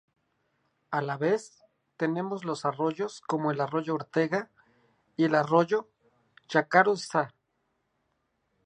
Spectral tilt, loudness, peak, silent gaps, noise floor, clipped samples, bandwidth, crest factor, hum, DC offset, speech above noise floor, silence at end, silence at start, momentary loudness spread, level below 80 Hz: -6 dB/octave; -28 LUFS; -6 dBFS; none; -77 dBFS; under 0.1%; 10.5 kHz; 24 dB; none; under 0.1%; 49 dB; 1.4 s; 0.9 s; 10 LU; -80 dBFS